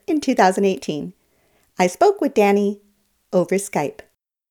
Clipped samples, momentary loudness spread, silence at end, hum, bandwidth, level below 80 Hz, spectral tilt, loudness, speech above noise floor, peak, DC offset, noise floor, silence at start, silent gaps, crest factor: under 0.1%; 12 LU; 0.6 s; none; 19.5 kHz; -64 dBFS; -5.5 dB/octave; -19 LUFS; 43 dB; -2 dBFS; under 0.1%; -62 dBFS; 0.1 s; none; 18 dB